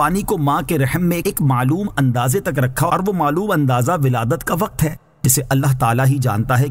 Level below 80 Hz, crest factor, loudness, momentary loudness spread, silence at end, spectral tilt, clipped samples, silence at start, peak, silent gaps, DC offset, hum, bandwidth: -40 dBFS; 14 dB; -17 LUFS; 4 LU; 0 s; -6 dB/octave; under 0.1%; 0 s; -2 dBFS; none; under 0.1%; none; 16.5 kHz